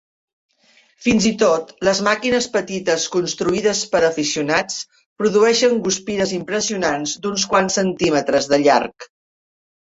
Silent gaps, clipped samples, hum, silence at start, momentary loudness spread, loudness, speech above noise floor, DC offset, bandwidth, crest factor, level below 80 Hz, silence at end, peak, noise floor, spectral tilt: 5.06-5.16 s; under 0.1%; none; 1 s; 7 LU; -18 LUFS; 38 dB; under 0.1%; 8 kHz; 16 dB; -52 dBFS; 0.85 s; -2 dBFS; -56 dBFS; -3.5 dB/octave